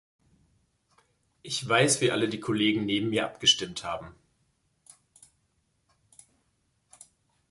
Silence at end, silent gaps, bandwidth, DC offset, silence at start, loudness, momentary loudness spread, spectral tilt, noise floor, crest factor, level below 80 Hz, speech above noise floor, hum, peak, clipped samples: 3.4 s; none; 11.5 kHz; under 0.1%; 1.45 s; -26 LUFS; 12 LU; -3 dB/octave; -73 dBFS; 22 dB; -64 dBFS; 46 dB; none; -8 dBFS; under 0.1%